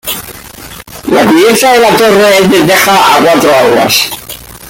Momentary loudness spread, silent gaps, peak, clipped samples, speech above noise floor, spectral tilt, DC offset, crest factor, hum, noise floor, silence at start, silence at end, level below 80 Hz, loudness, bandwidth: 20 LU; none; 0 dBFS; 0.2%; 22 dB; -3.5 dB/octave; under 0.1%; 8 dB; none; -28 dBFS; 0.05 s; 0 s; -40 dBFS; -6 LUFS; 17.5 kHz